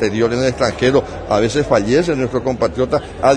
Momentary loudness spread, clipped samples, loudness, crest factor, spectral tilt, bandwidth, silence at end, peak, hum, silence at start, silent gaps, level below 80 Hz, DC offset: 5 LU; under 0.1%; -16 LUFS; 16 dB; -5.5 dB/octave; 10.5 kHz; 0 s; 0 dBFS; none; 0 s; none; -36 dBFS; under 0.1%